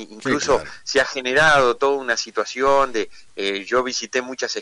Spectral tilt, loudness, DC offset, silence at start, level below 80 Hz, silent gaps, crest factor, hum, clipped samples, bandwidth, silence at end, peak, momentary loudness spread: -2.5 dB/octave; -20 LUFS; under 0.1%; 0 s; -48 dBFS; none; 12 dB; none; under 0.1%; 11 kHz; 0 s; -8 dBFS; 10 LU